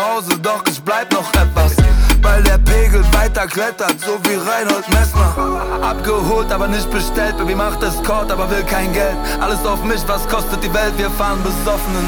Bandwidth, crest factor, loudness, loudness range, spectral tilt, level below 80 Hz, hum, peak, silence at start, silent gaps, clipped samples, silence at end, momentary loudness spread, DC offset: over 20 kHz; 12 dB; -16 LUFS; 4 LU; -4.5 dB/octave; -16 dBFS; none; -2 dBFS; 0 s; none; under 0.1%; 0 s; 5 LU; under 0.1%